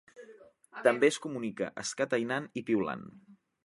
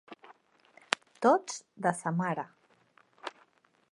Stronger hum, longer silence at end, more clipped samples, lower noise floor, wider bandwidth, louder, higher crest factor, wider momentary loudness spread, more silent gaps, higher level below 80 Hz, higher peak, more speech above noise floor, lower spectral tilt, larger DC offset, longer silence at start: neither; second, 0.3 s vs 0.6 s; neither; second, -56 dBFS vs -67 dBFS; about the same, 11.5 kHz vs 11.5 kHz; about the same, -31 LUFS vs -31 LUFS; second, 24 dB vs 30 dB; second, 13 LU vs 19 LU; neither; first, -74 dBFS vs -84 dBFS; second, -10 dBFS vs -4 dBFS; second, 25 dB vs 38 dB; about the same, -4 dB/octave vs -4.5 dB/octave; neither; about the same, 0.15 s vs 0.1 s